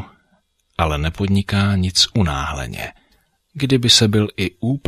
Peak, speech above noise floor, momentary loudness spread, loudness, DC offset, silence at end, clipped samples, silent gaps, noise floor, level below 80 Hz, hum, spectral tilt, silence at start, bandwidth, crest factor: -2 dBFS; 45 dB; 15 LU; -17 LUFS; under 0.1%; 0.1 s; under 0.1%; none; -63 dBFS; -34 dBFS; none; -4.5 dB/octave; 0 s; 15.5 kHz; 18 dB